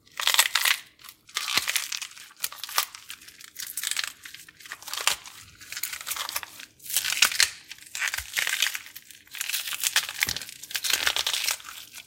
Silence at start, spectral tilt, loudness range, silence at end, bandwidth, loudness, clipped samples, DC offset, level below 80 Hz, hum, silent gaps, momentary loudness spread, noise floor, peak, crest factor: 0.15 s; 2.5 dB/octave; 6 LU; 0.05 s; 17 kHz; -26 LUFS; under 0.1%; under 0.1%; -62 dBFS; none; none; 21 LU; -50 dBFS; 0 dBFS; 30 dB